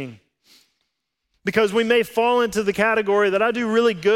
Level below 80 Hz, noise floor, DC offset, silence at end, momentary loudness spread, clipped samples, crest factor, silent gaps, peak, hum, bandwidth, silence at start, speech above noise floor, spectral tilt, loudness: -58 dBFS; -77 dBFS; under 0.1%; 0 s; 4 LU; under 0.1%; 16 dB; none; -4 dBFS; none; 16.5 kHz; 0 s; 58 dB; -4.5 dB/octave; -19 LUFS